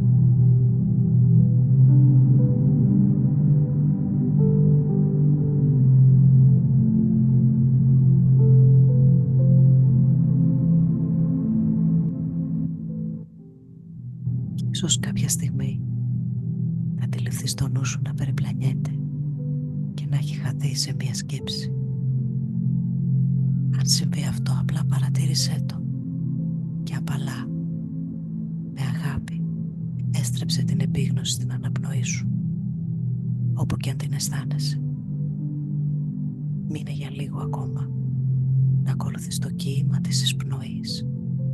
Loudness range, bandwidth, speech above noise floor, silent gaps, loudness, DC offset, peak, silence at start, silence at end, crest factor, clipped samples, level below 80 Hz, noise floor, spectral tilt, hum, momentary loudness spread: 10 LU; 12.5 kHz; 20 dB; none; -22 LUFS; under 0.1%; -6 dBFS; 0 s; 0 s; 14 dB; under 0.1%; -46 dBFS; -44 dBFS; -6.5 dB/octave; none; 12 LU